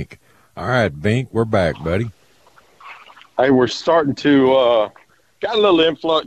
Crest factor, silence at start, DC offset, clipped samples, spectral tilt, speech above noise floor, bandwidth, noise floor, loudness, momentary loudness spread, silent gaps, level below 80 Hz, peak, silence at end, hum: 16 dB; 0 s; under 0.1%; under 0.1%; -6.5 dB/octave; 36 dB; 9.6 kHz; -52 dBFS; -17 LUFS; 13 LU; none; -46 dBFS; -2 dBFS; 0 s; none